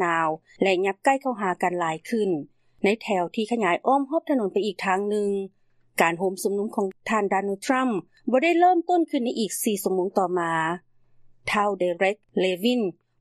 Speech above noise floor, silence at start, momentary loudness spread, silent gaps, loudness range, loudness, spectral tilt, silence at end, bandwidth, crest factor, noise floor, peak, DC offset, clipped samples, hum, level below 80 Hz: 30 dB; 0 s; 6 LU; none; 2 LU; -24 LUFS; -4.5 dB/octave; 0.3 s; 13 kHz; 20 dB; -54 dBFS; -4 dBFS; under 0.1%; under 0.1%; none; -70 dBFS